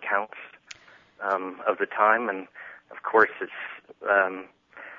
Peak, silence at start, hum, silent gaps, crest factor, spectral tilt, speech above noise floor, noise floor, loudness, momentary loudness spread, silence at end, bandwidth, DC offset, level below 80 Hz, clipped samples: -6 dBFS; 0 s; none; none; 22 dB; -4.5 dB/octave; 27 dB; -52 dBFS; -25 LUFS; 22 LU; 0 s; 7.6 kHz; under 0.1%; -78 dBFS; under 0.1%